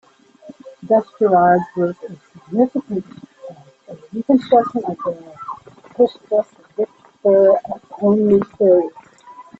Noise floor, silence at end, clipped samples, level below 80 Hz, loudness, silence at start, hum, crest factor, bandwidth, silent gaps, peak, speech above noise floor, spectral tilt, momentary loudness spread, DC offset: -43 dBFS; 0.2 s; under 0.1%; -58 dBFS; -17 LUFS; 0.45 s; none; 16 dB; 7.8 kHz; none; -2 dBFS; 27 dB; -9 dB/octave; 21 LU; under 0.1%